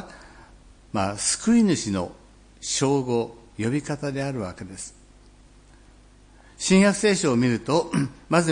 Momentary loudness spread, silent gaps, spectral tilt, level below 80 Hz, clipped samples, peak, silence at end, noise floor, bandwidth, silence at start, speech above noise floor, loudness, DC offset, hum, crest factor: 16 LU; none; -4.5 dB/octave; -52 dBFS; under 0.1%; -4 dBFS; 0 s; -51 dBFS; 10.5 kHz; 0 s; 29 dB; -23 LUFS; under 0.1%; none; 20 dB